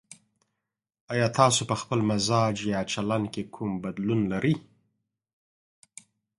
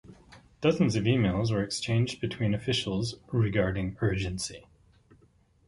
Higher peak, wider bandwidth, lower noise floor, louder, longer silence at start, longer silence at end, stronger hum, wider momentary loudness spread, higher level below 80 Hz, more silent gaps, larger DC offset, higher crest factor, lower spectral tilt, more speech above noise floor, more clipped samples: first, -6 dBFS vs -10 dBFS; about the same, 11.5 kHz vs 11.5 kHz; first, -85 dBFS vs -63 dBFS; first, -26 LUFS vs -29 LUFS; about the same, 0.1 s vs 0.1 s; first, 1.8 s vs 1.1 s; neither; first, 10 LU vs 7 LU; second, -60 dBFS vs -48 dBFS; first, 1.01-1.08 s vs none; neither; about the same, 24 dB vs 20 dB; about the same, -5 dB/octave vs -6 dB/octave; first, 59 dB vs 35 dB; neither